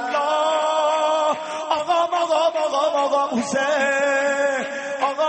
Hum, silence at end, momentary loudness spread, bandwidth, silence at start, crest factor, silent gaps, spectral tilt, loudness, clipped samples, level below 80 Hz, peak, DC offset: none; 0 s; 5 LU; 8.8 kHz; 0 s; 14 dB; none; -2.5 dB/octave; -20 LUFS; under 0.1%; -70 dBFS; -6 dBFS; under 0.1%